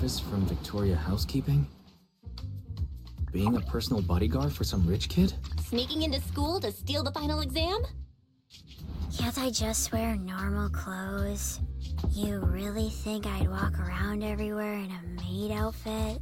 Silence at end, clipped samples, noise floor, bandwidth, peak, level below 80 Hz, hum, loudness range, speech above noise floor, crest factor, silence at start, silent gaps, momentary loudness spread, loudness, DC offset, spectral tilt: 0 s; under 0.1%; -58 dBFS; 17 kHz; -14 dBFS; -36 dBFS; none; 3 LU; 29 dB; 16 dB; 0 s; none; 10 LU; -31 LUFS; under 0.1%; -5.5 dB/octave